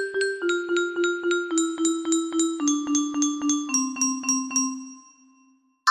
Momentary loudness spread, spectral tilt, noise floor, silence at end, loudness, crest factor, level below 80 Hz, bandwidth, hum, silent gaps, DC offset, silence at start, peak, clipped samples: 3 LU; -0.5 dB/octave; -61 dBFS; 0 s; -24 LUFS; 20 dB; -72 dBFS; 15 kHz; none; none; under 0.1%; 0 s; -6 dBFS; under 0.1%